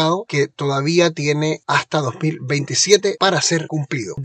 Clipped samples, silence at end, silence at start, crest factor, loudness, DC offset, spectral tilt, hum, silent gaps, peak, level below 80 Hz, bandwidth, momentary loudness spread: under 0.1%; 0 s; 0 s; 18 dB; -18 LUFS; under 0.1%; -4 dB/octave; none; none; 0 dBFS; -62 dBFS; 9.4 kHz; 8 LU